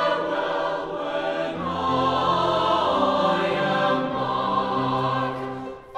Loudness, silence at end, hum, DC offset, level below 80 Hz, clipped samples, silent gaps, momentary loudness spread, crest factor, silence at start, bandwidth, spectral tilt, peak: -23 LUFS; 0 s; none; under 0.1%; -54 dBFS; under 0.1%; none; 7 LU; 14 dB; 0 s; 11 kHz; -6 dB/octave; -8 dBFS